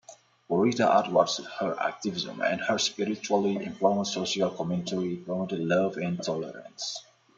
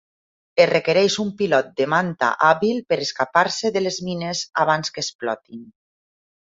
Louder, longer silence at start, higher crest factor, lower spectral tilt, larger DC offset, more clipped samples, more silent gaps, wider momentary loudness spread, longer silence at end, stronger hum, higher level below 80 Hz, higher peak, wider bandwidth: second, -28 LUFS vs -20 LUFS; second, 0.1 s vs 0.55 s; about the same, 22 dB vs 20 dB; about the same, -4.5 dB/octave vs -4 dB/octave; neither; neither; second, none vs 5.15-5.19 s; about the same, 10 LU vs 9 LU; second, 0.35 s vs 0.85 s; neither; second, -70 dBFS vs -64 dBFS; second, -6 dBFS vs -2 dBFS; first, 9.2 kHz vs 7.8 kHz